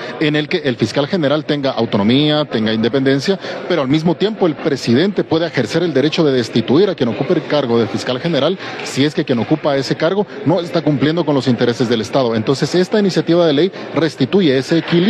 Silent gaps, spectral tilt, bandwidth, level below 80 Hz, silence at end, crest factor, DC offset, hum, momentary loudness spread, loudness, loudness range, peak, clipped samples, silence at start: none; -6 dB/octave; 12.5 kHz; -56 dBFS; 0 s; 12 dB; under 0.1%; none; 5 LU; -16 LUFS; 2 LU; -2 dBFS; under 0.1%; 0 s